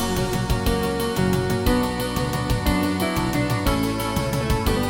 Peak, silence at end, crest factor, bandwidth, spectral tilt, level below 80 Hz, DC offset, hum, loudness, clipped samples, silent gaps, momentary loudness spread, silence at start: -6 dBFS; 0 s; 14 dB; 17 kHz; -5.5 dB/octave; -30 dBFS; under 0.1%; none; -23 LUFS; under 0.1%; none; 2 LU; 0 s